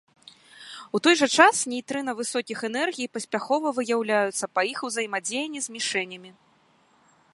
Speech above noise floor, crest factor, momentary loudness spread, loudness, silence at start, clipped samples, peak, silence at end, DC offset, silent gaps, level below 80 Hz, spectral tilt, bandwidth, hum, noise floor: 37 dB; 26 dB; 13 LU; -24 LUFS; 0.55 s; under 0.1%; -2 dBFS; 1 s; under 0.1%; none; -78 dBFS; -2 dB/octave; 11.5 kHz; none; -62 dBFS